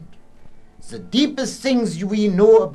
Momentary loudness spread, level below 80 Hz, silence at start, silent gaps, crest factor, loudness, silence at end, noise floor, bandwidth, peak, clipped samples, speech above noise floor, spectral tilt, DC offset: 14 LU; -48 dBFS; 0 s; none; 16 dB; -18 LUFS; 0 s; -39 dBFS; 12 kHz; -2 dBFS; under 0.1%; 22 dB; -5.5 dB/octave; under 0.1%